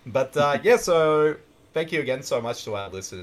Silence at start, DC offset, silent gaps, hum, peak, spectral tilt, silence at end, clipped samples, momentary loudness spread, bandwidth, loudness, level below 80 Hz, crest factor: 0.05 s; under 0.1%; none; none; -6 dBFS; -4.5 dB/octave; 0 s; under 0.1%; 13 LU; 14 kHz; -23 LUFS; -58 dBFS; 18 dB